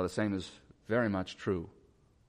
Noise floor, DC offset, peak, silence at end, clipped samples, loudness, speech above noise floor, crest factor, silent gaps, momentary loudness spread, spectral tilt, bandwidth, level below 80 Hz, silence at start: -65 dBFS; under 0.1%; -18 dBFS; 0.6 s; under 0.1%; -34 LUFS; 31 dB; 16 dB; none; 18 LU; -6.5 dB/octave; 14 kHz; -62 dBFS; 0 s